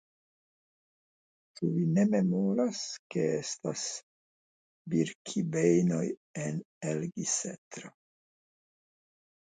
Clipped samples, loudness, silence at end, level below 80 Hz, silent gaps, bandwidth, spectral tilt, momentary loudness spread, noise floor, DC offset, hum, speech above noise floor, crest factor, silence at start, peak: under 0.1%; -31 LUFS; 1.65 s; -76 dBFS; 2.99-3.10 s, 4.03-4.85 s, 5.15-5.25 s, 6.17-6.34 s, 6.65-6.81 s, 7.58-7.71 s; 9.6 kHz; -5.5 dB/octave; 12 LU; under -90 dBFS; under 0.1%; none; over 59 dB; 20 dB; 1.6 s; -12 dBFS